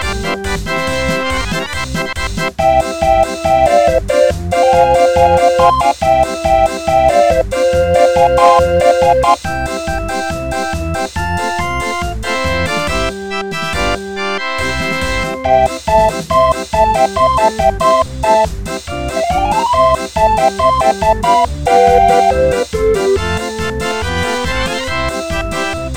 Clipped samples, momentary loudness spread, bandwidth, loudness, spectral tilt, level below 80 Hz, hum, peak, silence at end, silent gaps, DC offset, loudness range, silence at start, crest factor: under 0.1%; 9 LU; 17.5 kHz; -13 LUFS; -4.5 dB/octave; -26 dBFS; none; 0 dBFS; 0 s; none; 0.8%; 6 LU; 0 s; 12 dB